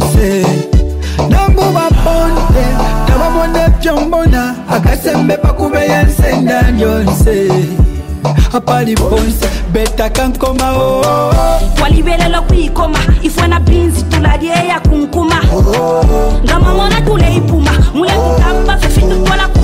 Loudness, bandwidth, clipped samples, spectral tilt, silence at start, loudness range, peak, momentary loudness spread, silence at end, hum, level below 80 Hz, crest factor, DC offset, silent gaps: -11 LUFS; 16.5 kHz; under 0.1%; -6 dB/octave; 0 s; 1 LU; -2 dBFS; 3 LU; 0 s; none; -12 dBFS; 8 dB; under 0.1%; none